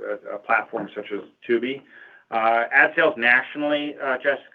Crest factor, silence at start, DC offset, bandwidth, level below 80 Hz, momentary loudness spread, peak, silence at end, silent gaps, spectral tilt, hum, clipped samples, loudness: 20 dB; 0 s; under 0.1%; 5.2 kHz; -78 dBFS; 15 LU; -2 dBFS; 0.1 s; none; -6.5 dB/octave; none; under 0.1%; -21 LUFS